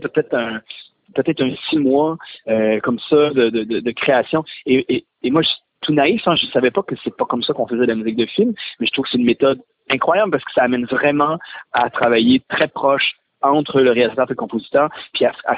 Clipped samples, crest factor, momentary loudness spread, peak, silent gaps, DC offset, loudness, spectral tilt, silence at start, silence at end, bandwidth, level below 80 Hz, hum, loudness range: under 0.1%; 16 dB; 7 LU; -2 dBFS; none; under 0.1%; -17 LUFS; -9.5 dB/octave; 0 s; 0 s; 4 kHz; -56 dBFS; none; 2 LU